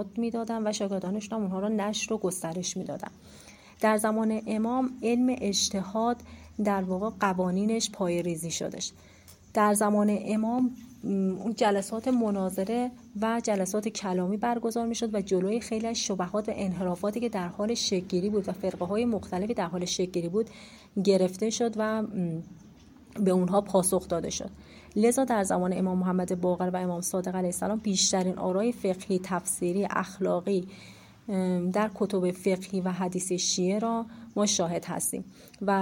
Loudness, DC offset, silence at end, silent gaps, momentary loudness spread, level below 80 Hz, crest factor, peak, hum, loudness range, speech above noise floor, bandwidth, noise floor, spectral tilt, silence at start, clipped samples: -29 LUFS; under 0.1%; 0 s; none; 7 LU; -60 dBFS; 18 dB; -10 dBFS; none; 2 LU; 24 dB; 16.5 kHz; -52 dBFS; -4.5 dB/octave; 0 s; under 0.1%